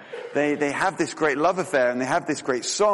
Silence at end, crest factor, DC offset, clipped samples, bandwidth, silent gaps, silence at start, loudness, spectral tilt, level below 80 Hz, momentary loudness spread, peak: 0 s; 14 dB; under 0.1%; under 0.1%; 11.5 kHz; none; 0 s; -23 LUFS; -3.5 dB/octave; -64 dBFS; 4 LU; -8 dBFS